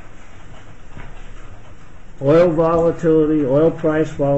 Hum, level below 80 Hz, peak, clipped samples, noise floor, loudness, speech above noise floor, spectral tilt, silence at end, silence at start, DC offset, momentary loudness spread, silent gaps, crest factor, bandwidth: none; -36 dBFS; -4 dBFS; under 0.1%; -39 dBFS; -16 LUFS; 25 dB; -8.5 dB/octave; 0 s; 0.05 s; 2%; 5 LU; none; 14 dB; 8.2 kHz